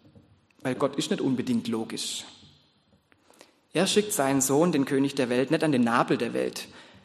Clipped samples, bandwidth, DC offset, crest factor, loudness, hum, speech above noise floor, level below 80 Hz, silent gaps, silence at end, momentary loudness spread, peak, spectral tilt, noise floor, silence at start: under 0.1%; 13 kHz; under 0.1%; 20 dB; -26 LUFS; none; 39 dB; -70 dBFS; none; 0.2 s; 10 LU; -8 dBFS; -4.5 dB/octave; -64 dBFS; 0.65 s